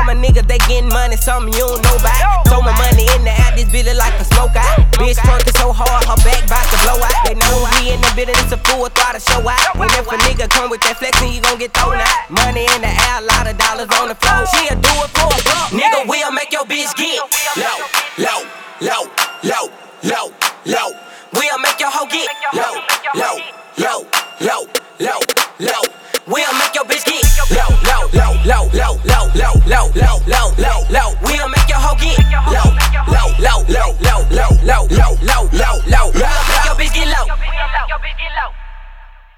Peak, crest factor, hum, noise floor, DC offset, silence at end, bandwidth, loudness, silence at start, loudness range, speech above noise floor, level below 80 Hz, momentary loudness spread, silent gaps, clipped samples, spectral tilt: 0 dBFS; 12 dB; none; -35 dBFS; under 0.1%; 0.3 s; 19.5 kHz; -13 LUFS; 0 s; 5 LU; 24 dB; -14 dBFS; 7 LU; none; under 0.1%; -3.5 dB/octave